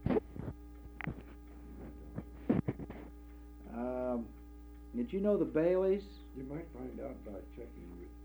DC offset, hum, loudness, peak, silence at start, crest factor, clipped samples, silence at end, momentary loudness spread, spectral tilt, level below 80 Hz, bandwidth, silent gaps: under 0.1%; 60 Hz at -55 dBFS; -38 LUFS; -18 dBFS; 0 s; 20 dB; under 0.1%; 0 s; 21 LU; -9.5 dB/octave; -52 dBFS; over 20 kHz; none